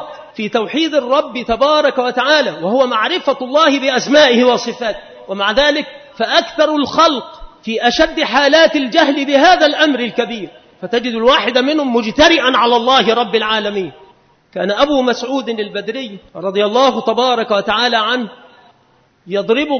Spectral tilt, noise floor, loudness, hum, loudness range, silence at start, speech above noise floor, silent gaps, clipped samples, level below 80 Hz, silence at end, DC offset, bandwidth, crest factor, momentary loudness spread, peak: -3.5 dB/octave; -54 dBFS; -13 LUFS; none; 4 LU; 0 s; 40 dB; none; under 0.1%; -46 dBFS; 0 s; under 0.1%; 6.6 kHz; 14 dB; 13 LU; 0 dBFS